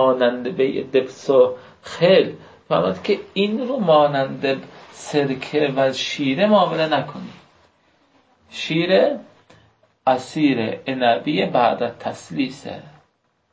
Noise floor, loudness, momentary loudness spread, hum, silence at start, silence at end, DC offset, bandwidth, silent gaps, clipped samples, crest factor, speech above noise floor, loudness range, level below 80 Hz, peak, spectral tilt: -65 dBFS; -20 LUFS; 16 LU; none; 0 s; 0.65 s; under 0.1%; 8 kHz; none; under 0.1%; 16 dB; 46 dB; 3 LU; -62 dBFS; -4 dBFS; -5.5 dB/octave